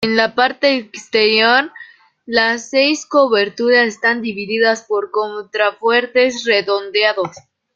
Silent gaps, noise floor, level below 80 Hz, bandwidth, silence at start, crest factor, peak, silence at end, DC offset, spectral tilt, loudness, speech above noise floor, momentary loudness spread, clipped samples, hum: none; -42 dBFS; -62 dBFS; 7.8 kHz; 0 s; 16 dB; 0 dBFS; 0.35 s; under 0.1%; -3 dB/octave; -15 LUFS; 26 dB; 8 LU; under 0.1%; none